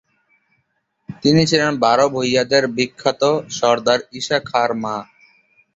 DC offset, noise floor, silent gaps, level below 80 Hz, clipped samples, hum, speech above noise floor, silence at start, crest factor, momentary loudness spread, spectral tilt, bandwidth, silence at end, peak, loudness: under 0.1%; -69 dBFS; none; -56 dBFS; under 0.1%; none; 52 dB; 1.1 s; 18 dB; 6 LU; -4.5 dB/octave; 8 kHz; 0.7 s; -2 dBFS; -17 LUFS